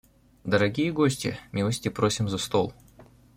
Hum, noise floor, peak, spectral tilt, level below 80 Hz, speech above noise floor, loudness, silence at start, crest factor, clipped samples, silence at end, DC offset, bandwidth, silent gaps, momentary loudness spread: none; -53 dBFS; -6 dBFS; -5 dB/octave; -56 dBFS; 28 dB; -26 LUFS; 0.45 s; 20 dB; under 0.1%; 0.35 s; under 0.1%; 16.5 kHz; none; 7 LU